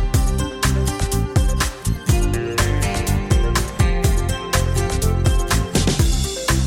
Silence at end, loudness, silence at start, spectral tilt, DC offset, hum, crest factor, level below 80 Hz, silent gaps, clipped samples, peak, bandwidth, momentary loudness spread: 0 s; -20 LUFS; 0 s; -4.5 dB/octave; under 0.1%; none; 14 dB; -22 dBFS; none; under 0.1%; -4 dBFS; 17 kHz; 3 LU